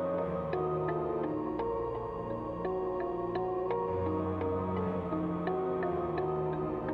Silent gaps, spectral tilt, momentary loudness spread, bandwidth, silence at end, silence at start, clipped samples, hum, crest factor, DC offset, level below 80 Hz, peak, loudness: none; -10 dB/octave; 3 LU; 5 kHz; 0 s; 0 s; under 0.1%; none; 14 dB; under 0.1%; -54 dBFS; -20 dBFS; -34 LUFS